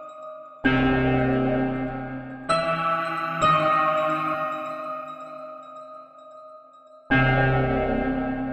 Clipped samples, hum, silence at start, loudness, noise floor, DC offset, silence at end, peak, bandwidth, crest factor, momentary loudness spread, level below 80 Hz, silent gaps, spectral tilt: under 0.1%; none; 0 s; -23 LUFS; -50 dBFS; under 0.1%; 0 s; -8 dBFS; 8.8 kHz; 16 dB; 19 LU; -40 dBFS; none; -7 dB/octave